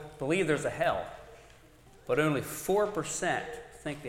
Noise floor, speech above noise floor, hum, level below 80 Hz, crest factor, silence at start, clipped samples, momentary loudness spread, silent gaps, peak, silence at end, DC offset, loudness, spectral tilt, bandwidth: -56 dBFS; 26 dB; none; -58 dBFS; 20 dB; 0 s; under 0.1%; 14 LU; none; -12 dBFS; 0 s; under 0.1%; -31 LUFS; -4.5 dB/octave; 17 kHz